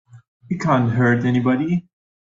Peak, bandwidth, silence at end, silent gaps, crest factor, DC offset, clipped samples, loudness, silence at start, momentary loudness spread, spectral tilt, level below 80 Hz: -4 dBFS; 7.6 kHz; 0.5 s; 0.28-0.40 s; 16 dB; under 0.1%; under 0.1%; -19 LUFS; 0.15 s; 8 LU; -8 dB/octave; -56 dBFS